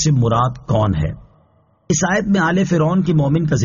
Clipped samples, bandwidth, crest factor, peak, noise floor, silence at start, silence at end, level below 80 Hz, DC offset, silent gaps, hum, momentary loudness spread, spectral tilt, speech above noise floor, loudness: under 0.1%; 7.4 kHz; 12 dB; -4 dBFS; -56 dBFS; 0 s; 0 s; -38 dBFS; under 0.1%; none; none; 6 LU; -6.5 dB/octave; 40 dB; -17 LUFS